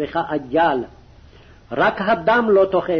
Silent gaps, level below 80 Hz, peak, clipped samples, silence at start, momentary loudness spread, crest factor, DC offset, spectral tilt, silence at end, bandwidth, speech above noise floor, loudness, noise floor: none; -48 dBFS; -6 dBFS; under 0.1%; 0 s; 11 LU; 12 dB; under 0.1%; -7.5 dB/octave; 0 s; 6.4 kHz; 28 dB; -18 LUFS; -46 dBFS